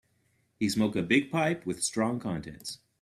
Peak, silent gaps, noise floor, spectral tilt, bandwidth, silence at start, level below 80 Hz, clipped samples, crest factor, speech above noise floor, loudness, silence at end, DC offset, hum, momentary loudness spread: -10 dBFS; none; -71 dBFS; -4.5 dB/octave; 15 kHz; 0.6 s; -62 dBFS; under 0.1%; 20 dB; 42 dB; -29 LUFS; 0.25 s; under 0.1%; none; 13 LU